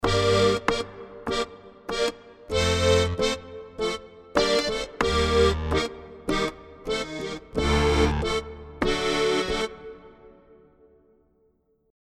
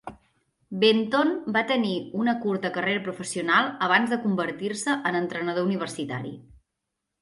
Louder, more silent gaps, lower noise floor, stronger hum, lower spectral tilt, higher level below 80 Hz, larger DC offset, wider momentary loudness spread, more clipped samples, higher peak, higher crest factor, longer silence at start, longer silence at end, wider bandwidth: about the same, -25 LUFS vs -25 LUFS; neither; second, -66 dBFS vs -83 dBFS; neither; about the same, -4.5 dB/octave vs -4.5 dB/octave; first, -36 dBFS vs -66 dBFS; neither; first, 15 LU vs 10 LU; neither; about the same, -6 dBFS vs -6 dBFS; about the same, 20 dB vs 20 dB; about the same, 0 s vs 0.05 s; first, 1.75 s vs 0.8 s; first, 14 kHz vs 11.5 kHz